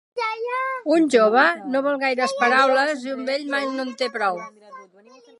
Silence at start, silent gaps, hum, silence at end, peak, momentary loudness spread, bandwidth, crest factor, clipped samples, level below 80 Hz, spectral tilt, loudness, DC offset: 0.15 s; none; none; 0.55 s; -2 dBFS; 10 LU; 11.5 kHz; 18 dB; under 0.1%; -80 dBFS; -3.5 dB/octave; -20 LUFS; under 0.1%